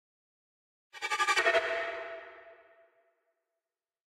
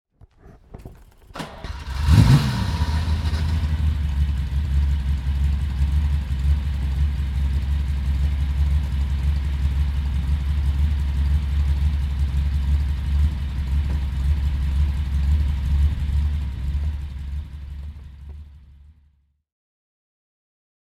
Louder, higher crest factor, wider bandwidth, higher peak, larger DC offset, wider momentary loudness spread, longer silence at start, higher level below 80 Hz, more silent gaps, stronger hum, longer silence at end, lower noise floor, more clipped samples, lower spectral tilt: second, -30 LUFS vs -23 LUFS; about the same, 22 dB vs 20 dB; first, 15.5 kHz vs 11 kHz; second, -14 dBFS vs -2 dBFS; neither; first, 19 LU vs 12 LU; first, 0.95 s vs 0.45 s; second, -76 dBFS vs -22 dBFS; neither; neither; second, 1.65 s vs 2.15 s; first, under -90 dBFS vs -61 dBFS; neither; second, 0 dB/octave vs -7 dB/octave